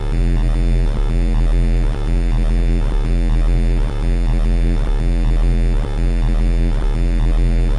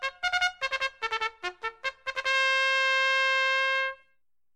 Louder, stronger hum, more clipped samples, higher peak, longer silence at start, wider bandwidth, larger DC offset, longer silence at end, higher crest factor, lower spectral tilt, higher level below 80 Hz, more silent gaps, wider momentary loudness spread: first, -19 LUFS vs -26 LUFS; neither; neither; first, -8 dBFS vs -14 dBFS; about the same, 0 s vs 0 s; second, 9.4 kHz vs 13 kHz; neither; second, 0 s vs 0.6 s; second, 6 dB vs 14 dB; first, -7.5 dB/octave vs 1 dB/octave; first, -14 dBFS vs -64 dBFS; neither; second, 2 LU vs 11 LU